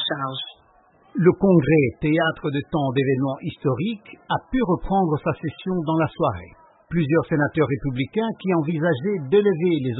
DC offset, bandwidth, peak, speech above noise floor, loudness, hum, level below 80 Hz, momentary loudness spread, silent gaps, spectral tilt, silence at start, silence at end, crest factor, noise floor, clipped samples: under 0.1%; 4.1 kHz; -2 dBFS; 35 dB; -22 LUFS; none; -46 dBFS; 9 LU; none; -12 dB/octave; 0 s; 0 s; 18 dB; -56 dBFS; under 0.1%